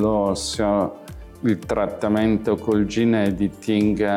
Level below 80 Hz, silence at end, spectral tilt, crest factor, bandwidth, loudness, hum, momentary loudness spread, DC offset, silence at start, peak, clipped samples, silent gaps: -42 dBFS; 0 s; -6 dB/octave; 12 dB; 14 kHz; -21 LUFS; none; 6 LU; under 0.1%; 0 s; -8 dBFS; under 0.1%; none